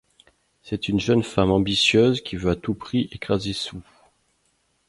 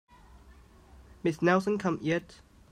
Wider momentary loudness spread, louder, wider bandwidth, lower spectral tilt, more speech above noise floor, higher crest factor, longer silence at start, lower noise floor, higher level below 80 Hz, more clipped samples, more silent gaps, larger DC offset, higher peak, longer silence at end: first, 12 LU vs 8 LU; first, -22 LUFS vs -29 LUFS; about the same, 11.5 kHz vs 12 kHz; about the same, -5.5 dB/octave vs -6.5 dB/octave; first, 46 dB vs 27 dB; about the same, 20 dB vs 20 dB; second, 0.65 s vs 1.25 s; first, -68 dBFS vs -55 dBFS; first, -46 dBFS vs -58 dBFS; neither; neither; neither; first, -4 dBFS vs -12 dBFS; first, 1.05 s vs 0.5 s